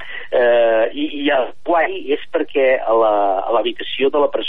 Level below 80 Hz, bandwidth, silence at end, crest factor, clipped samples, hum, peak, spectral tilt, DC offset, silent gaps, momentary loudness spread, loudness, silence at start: -58 dBFS; 4 kHz; 0 s; 12 dB; under 0.1%; none; -4 dBFS; -6.5 dB/octave; 3%; none; 7 LU; -17 LUFS; 0 s